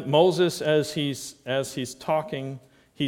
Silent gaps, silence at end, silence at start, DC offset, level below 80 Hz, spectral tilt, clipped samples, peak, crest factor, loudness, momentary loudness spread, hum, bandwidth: none; 0 s; 0 s; under 0.1%; -64 dBFS; -5 dB/octave; under 0.1%; -6 dBFS; 20 dB; -25 LUFS; 14 LU; none; 17 kHz